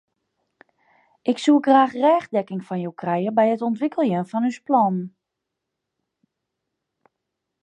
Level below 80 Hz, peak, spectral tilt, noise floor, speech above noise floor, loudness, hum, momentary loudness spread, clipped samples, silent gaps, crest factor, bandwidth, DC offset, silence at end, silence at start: -78 dBFS; -4 dBFS; -7 dB/octave; -82 dBFS; 62 dB; -21 LUFS; none; 13 LU; under 0.1%; none; 20 dB; 9.6 kHz; under 0.1%; 2.55 s; 1.25 s